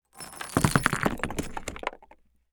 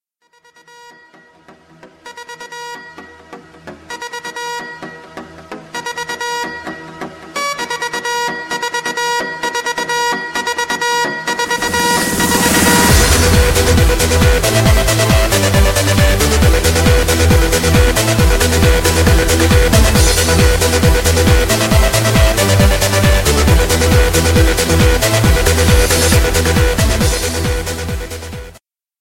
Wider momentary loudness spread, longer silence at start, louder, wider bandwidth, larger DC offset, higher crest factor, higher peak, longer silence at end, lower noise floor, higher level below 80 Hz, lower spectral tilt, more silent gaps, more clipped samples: about the same, 14 LU vs 16 LU; second, 0.15 s vs 1.85 s; second, -29 LUFS vs -12 LUFS; first, over 20 kHz vs 16.5 kHz; neither; first, 28 dB vs 12 dB; about the same, -2 dBFS vs 0 dBFS; about the same, 0.45 s vs 0.5 s; first, -58 dBFS vs -52 dBFS; second, -44 dBFS vs -18 dBFS; about the same, -4.5 dB/octave vs -4 dB/octave; neither; neither